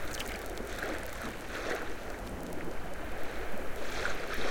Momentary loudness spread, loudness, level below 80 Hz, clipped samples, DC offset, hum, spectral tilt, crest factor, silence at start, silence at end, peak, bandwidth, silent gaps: 6 LU; -39 LUFS; -46 dBFS; under 0.1%; under 0.1%; none; -4 dB/octave; 16 dB; 0 s; 0 s; -18 dBFS; 17 kHz; none